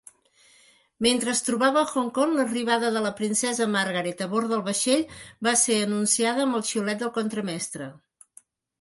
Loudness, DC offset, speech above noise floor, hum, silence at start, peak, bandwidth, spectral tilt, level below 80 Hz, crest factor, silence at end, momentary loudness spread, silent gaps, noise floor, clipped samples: -24 LUFS; under 0.1%; 34 dB; none; 1 s; -8 dBFS; 12 kHz; -3 dB/octave; -66 dBFS; 18 dB; 0.85 s; 7 LU; none; -59 dBFS; under 0.1%